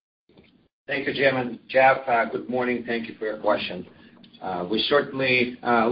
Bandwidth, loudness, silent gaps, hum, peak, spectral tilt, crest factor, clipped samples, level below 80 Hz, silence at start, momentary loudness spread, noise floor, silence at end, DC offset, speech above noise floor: 5.6 kHz; -23 LUFS; none; none; -6 dBFS; -9.5 dB/octave; 18 dB; under 0.1%; -60 dBFS; 0.9 s; 12 LU; -57 dBFS; 0 s; under 0.1%; 33 dB